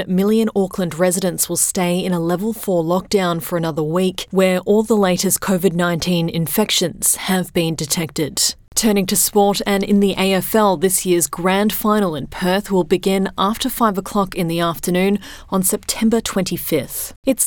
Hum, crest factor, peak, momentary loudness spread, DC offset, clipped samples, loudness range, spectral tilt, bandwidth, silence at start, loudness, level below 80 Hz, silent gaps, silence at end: none; 14 dB; -2 dBFS; 5 LU; under 0.1%; under 0.1%; 3 LU; -4 dB/octave; 20 kHz; 0 s; -17 LUFS; -44 dBFS; 17.16-17.23 s; 0 s